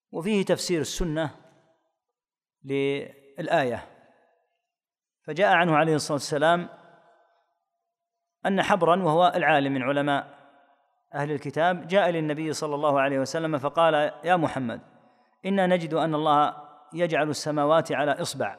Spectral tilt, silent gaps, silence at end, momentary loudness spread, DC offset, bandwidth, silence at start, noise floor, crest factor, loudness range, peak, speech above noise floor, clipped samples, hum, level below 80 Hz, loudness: -5 dB/octave; none; 0.05 s; 12 LU; under 0.1%; 15 kHz; 0.15 s; under -90 dBFS; 20 dB; 6 LU; -6 dBFS; over 66 dB; under 0.1%; none; -52 dBFS; -25 LUFS